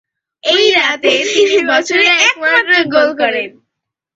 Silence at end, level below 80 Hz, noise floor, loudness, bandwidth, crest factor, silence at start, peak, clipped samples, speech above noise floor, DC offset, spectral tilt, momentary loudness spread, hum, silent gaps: 0.65 s; -60 dBFS; -77 dBFS; -11 LUFS; 8 kHz; 14 dB; 0.45 s; 0 dBFS; under 0.1%; 65 dB; under 0.1%; -1.5 dB/octave; 7 LU; none; none